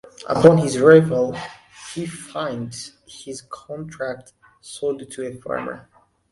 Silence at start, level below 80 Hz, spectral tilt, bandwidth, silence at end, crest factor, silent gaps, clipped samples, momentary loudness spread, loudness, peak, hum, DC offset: 0.2 s; -56 dBFS; -6 dB/octave; 11.5 kHz; 0.5 s; 20 dB; none; under 0.1%; 23 LU; -19 LUFS; 0 dBFS; none; under 0.1%